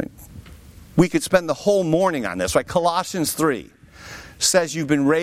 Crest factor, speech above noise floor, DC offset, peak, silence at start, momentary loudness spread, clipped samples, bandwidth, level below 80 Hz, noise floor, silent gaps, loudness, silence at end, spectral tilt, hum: 18 dB; 24 dB; under 0.1%; -4 dBFS; 0 s; 11 LU; under 0.1%; 16 kHz; -46 dBFS; -43 dBFS; none; -20 LUFS; 0 s; -4 dB/octave; none